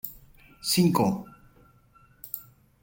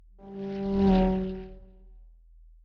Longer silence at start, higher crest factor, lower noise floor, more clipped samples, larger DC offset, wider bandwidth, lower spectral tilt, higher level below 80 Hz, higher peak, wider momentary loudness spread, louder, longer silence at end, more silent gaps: second, 0.05 s vs 0.2 s; about the same, 22 dB vs 18 dB; first, -59 dBFS vs -54 dBFS; neither; neither; first, 17 kHz vs 5.6 kHz; second, -5 dB/octave vs -9.5 dB/octave; second, -60 dBFS vs -40 dBFS; first, -8 dBFS vs -12 dBFS; about the same, 21 LU vs 21 LU; about the same, -27 LUFS vs -27 LUFS; second, 0.4 s vs 0.6 s; neither